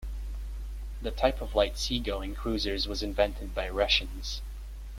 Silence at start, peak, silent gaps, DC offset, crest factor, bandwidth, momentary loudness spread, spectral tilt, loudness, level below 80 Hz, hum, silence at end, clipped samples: 0 s; -10 dBFS; none; under 0.1%; 20 dB; 16 kHz; 14 LU; -4 dB/octave; -30 LUFS; -36 dBFS; none; 0 s; under 0.1%